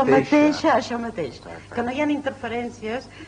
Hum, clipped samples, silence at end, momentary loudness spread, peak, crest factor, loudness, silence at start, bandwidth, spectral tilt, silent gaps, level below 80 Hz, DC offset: none; under 0.1%; 0 s; 14 LU; -6 dBFS; 16 dB; -23 LUFS; 0 s; 9.8 kHz; -5.5 dB/octave; none; -54 dBFS; under 0.1%